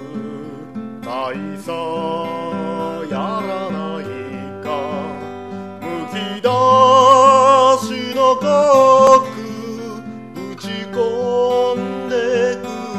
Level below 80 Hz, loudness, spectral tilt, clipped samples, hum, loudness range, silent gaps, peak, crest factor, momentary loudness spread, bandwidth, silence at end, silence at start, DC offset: -58 dBFS; -15 LUFS; -5 dB/octave; under 0.1%; none; 13 LU; none; 0 dBFS; 16 dB; 20 LU; 13.5 kHz; 0 s; 0 s; 0.3%